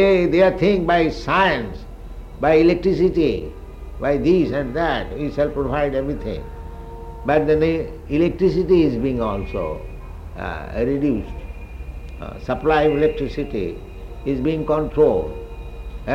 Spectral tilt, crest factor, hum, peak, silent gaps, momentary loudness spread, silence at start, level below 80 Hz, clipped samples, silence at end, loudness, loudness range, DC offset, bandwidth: -8 dB/octave; 16 dB; none; -4 dBFS; none; 20 LU; 0 s; -34 dBFS; under 0.1%; 0 s; -20 LUFS; 4 LU; under 0.1%; 8.6 kHz